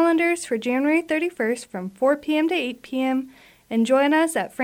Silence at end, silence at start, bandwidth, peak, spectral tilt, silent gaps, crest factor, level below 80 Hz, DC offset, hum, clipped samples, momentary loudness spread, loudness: 0 s; 0 s; 16 kHz; -8 dBFS; -4 dB/octave; none; 14 dB; -68 dBFS; under 0.1%; none; under 0.1%; 9 LU; -22 LUFS